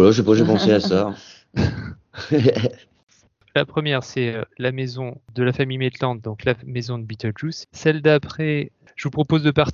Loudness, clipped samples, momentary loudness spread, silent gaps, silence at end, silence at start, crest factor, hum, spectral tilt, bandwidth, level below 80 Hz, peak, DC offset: -21 LUFS; under 0.1%; 13 LU; 3.03-3.07 s; 0 s; 0 s; 20 dB; none; -6.5 dB/octave; 7.4 kHz; -44 dBFS; 0 dBFS; under 0.1%